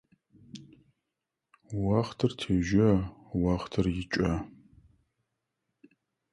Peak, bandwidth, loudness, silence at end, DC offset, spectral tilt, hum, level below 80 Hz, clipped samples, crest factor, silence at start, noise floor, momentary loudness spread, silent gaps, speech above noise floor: -10 dBFS; 11.5 kHz; -29 LUFS; 1.85 s; under 0.1%; -7 dB/octave; none; -48 dBFS; under 0.1%; 20 dB; 0.55 s; -86 dBFS; 24 LU; none; 59 dB